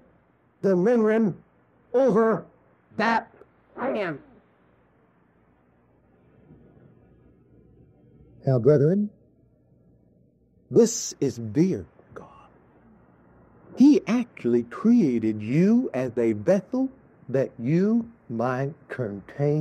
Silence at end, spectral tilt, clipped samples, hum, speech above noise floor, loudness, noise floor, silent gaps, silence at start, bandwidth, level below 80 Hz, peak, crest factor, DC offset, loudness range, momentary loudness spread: 0 s; -7 dB/octave; under 0.1%; none; 40 dB; -24 LUFS; -62 dBFS; none; 0.65 s; 13.5 kHz; -66 dBFS; -6 dBFS; 18 dB; under 0.1%; 9 LU; 13 LU